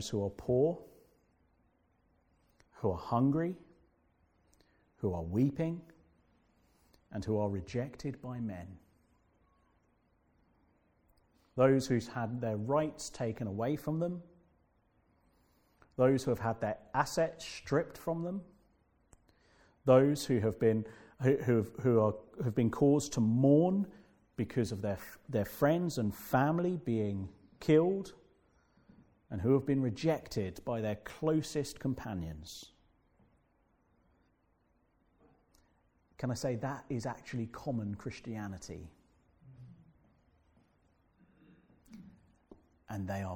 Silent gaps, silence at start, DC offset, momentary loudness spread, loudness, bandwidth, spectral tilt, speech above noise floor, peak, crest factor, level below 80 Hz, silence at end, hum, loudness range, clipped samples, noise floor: none; 0 s; under 0.1%; 15 LU; -33 LUFS; 18 kHz; -7 dB/octave; 41 dB; -12 dBFS; 22 dB; -64 dBFS; 0 s; none; 13 LU; under 0.1%; -74 dBFS